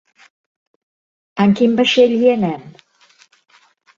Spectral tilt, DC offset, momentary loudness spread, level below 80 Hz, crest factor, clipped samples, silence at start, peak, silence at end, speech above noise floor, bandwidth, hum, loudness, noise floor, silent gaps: -6 dB/octave; under 0.1%; 14 LU; -60 dBFS; 16 dB; under 0.1%; 1.35 s; -2 dBFS; 1.25 s; 39 dB; 7.6 kHz; none; -14 LUFS; -53 dBFS; none